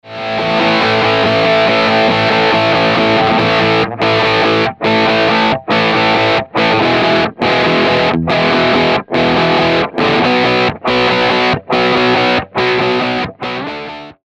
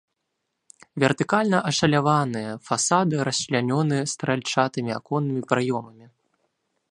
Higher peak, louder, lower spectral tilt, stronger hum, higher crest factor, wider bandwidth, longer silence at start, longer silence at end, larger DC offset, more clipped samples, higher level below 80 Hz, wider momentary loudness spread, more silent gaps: about the same, -4 dBFS vs -2 dBFS; first, -12 LUFS vs -23 LUFS; about the same, -5.5 dB/octave vs -4.5 dB/octave; neither; second, 8 dB vs 22 dB; second, 9.8 kHz vs 11 kHz; second, 0.05 s vs 0.95 s; second, 0.15 s vs 1 s; neither; neither; first, -42 dBFS vs -62 dBFS; second, 3 LU vs 7 LU; neither